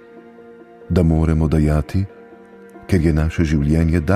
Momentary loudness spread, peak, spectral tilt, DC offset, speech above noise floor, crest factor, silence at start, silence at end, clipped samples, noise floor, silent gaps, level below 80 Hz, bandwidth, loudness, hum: 8 LU; -2 dBFS; -8.5 dB/octave; under 0.1%; 26 dB; 16 dB; 0.15 s; 0 s; under 0.1%; -42 dBFS; none; -26 dBFS; 12.5 kHz; -18 LUFS; none